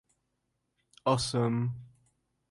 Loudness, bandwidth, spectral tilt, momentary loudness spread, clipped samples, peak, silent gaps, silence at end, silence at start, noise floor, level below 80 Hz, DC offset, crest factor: -31 LUFS; 11.5 kHz; -5.5 dB/octave; 8 LU; under 0.1%; -12 dBFS; none; 0.65 s; 1.05 s; -81 dBFS; -60 dBFS; under 0.1%; 22 dB